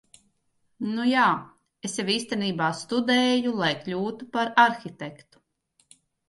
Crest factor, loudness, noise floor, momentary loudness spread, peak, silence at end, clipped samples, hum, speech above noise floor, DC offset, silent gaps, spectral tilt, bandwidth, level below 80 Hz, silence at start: 22 dB; -24 LUFS; -71 dBFS; 14 LU; -6 dBFS; 1.15 s; under 0.1%; none; 46 dB; under 0.1%; none; -4 dB/octave; 11.5 kHz; -72 dBFS; 0.8 s